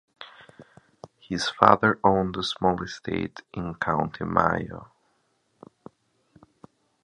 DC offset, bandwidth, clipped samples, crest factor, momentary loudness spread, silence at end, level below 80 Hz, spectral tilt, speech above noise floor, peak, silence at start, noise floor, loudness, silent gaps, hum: under 0.1%; 11 kHz; under 0.1%; 26 dB; 19 LU; 2.2 s; -52 dBFS; -5.5 dB/octave; 46 dB; 0 dBFS; 0.2 s; -70 dBFS; -24 LUFS; none; none